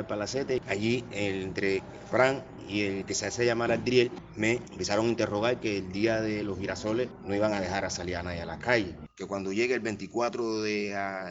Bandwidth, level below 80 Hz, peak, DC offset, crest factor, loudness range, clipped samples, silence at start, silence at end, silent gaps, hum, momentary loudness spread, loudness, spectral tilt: 8 kHz; -56 dBFS; -8 dBFS; under 0.1%; 22 dB; 3 LU; under 0.1%; 0 s; 0 s; none; none; 8 LU; -30 LUFS; -4 dB/octave